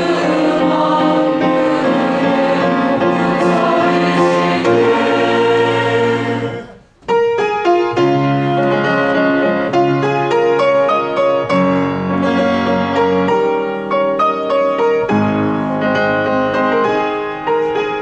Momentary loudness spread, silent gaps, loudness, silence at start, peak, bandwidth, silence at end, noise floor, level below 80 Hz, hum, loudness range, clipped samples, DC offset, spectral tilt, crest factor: 4 LU; none; -14 LUFS; 0 s; -2 dBFS; 9.8 kHz; 0 s; -35 dBFS; -50 dBFS; none; 2 LU; under 0.1%; under 0.1%; -6.5 dB/octave; 12 dB